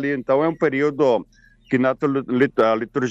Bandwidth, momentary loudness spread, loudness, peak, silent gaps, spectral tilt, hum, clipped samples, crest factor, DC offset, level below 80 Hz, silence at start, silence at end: 7.8 kHz; 5 LU; -20 LUFS; -6 dBFS; none; -7 dB/octave; none; under 0.1%; 14 dB; under 0.1%; -58 dBFS; 0 s; 0 s